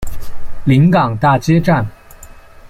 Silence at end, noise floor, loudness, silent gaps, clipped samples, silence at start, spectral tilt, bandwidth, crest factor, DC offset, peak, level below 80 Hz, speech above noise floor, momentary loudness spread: 0 s; -37 dBFS; -13 LUFS; none; under 0.1%; 0 s; -7.5 dB/octave; 15 kHz; 12 dB; under 0.1%; -2 dBFS; -30 dBFS; 25 dB; 17 LU